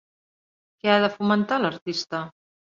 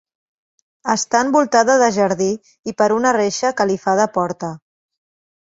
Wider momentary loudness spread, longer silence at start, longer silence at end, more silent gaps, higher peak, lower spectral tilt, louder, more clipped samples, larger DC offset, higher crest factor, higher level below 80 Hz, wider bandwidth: about the same, 11 LU vs 13 LU; about the same, 0.85 s vs 0.85 s; second, 0.5 s vs 0.85 s; about the same, 1.82-1.86 s vs 2.59-2.63 s; second, -6 dBFS vs -2 dBFS; first, -5.5 dB/octave vs -4 dB/octave; second, -24 LUFS vs -17 LUFS; neither; neither; about the same, 20 dB vs 16 dB; second, -70 dBFS vs -60 dBFS; about the same, 7.4 kHz vs 8 kHz